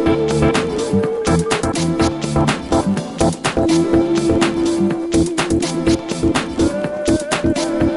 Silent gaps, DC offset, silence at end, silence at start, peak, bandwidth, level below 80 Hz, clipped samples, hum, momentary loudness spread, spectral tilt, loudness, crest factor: none; under 0.1%; 0 s; 0 s; -2 dBFS; 11.5 kHz; -32 dBFS; under 0.1%; none; 3 LU; -5.5 dB/octave; -17 LUFS; 16 dB